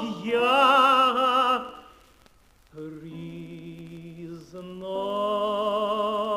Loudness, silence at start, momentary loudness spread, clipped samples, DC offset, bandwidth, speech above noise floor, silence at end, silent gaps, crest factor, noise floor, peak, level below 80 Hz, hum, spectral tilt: -22 LUFS; 0 s; 23 LU; under 0.1%; under 0.1%; 15.5 kHz; 32 dB; 0 s; none; 18 dB; -58 dBFS; -8 dBFS; -62 dBFS; none; -4.5 dB/octave